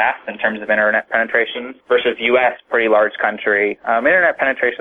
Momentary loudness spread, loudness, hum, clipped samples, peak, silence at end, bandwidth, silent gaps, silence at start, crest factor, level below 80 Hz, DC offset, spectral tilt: 6 LU; -16 LUFS; none; under 0.1%; -2 dBFS; 0.05 s; 4.1 kHz; none; 0 s; 14 dB; -58 dBFS; under 0.1%; -6 dB/octave